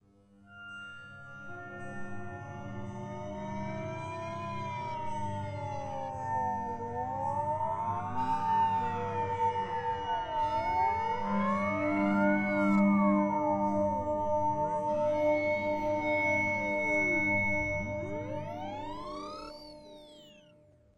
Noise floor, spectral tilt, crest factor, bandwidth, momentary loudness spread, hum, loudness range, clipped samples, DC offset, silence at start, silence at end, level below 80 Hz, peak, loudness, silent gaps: -61 dBFS; -7 dB/octave; 16 dB; 8.6 kHz; 16 LU; none; 12 LU; under 0.1%; under 0.1%; 0.5 s; 0.55 s; -58 dBFS; -16 dBFS; -31 LUFS; none